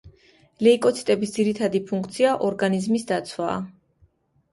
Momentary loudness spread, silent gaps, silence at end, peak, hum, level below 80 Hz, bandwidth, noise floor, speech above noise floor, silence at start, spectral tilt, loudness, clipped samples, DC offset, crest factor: 9 LU; none; 0.8 s; -6 dBFS; none; -62 dBFS; 11.5 kHz; -62 dBFS; 40 dB; 0.05 s; -5.5 dB/octave; -23 LUFS; under 0.1%; under 0.1%; 18 dB